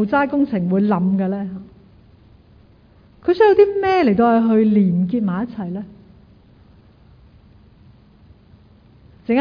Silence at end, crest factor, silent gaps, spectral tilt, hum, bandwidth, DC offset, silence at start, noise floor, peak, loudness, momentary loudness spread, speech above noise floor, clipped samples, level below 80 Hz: 0 s; 18 dB; none; -10 dB/octave; none; 5.2 kHz; under 0.1%; 0 s; -50 dBFS; -2 dBFS; -17 LUFS; 15 LU; 34 dB; under 0.1%; -52 dBFS